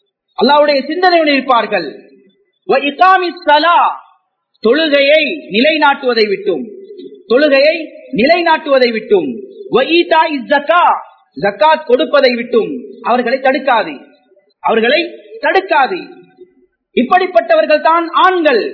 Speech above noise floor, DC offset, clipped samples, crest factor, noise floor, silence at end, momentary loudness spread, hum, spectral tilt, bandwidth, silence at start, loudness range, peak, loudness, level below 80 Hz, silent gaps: 45 dB; under 0.1%; 0.2%; 12 dB; -56 dBFS; 0 s; 11 LU; none; -6 dB/octave; 5.4 kHz; 0.4 s; 3 LU; 0 dBFS; -12 LUFS; -60 dBFS; none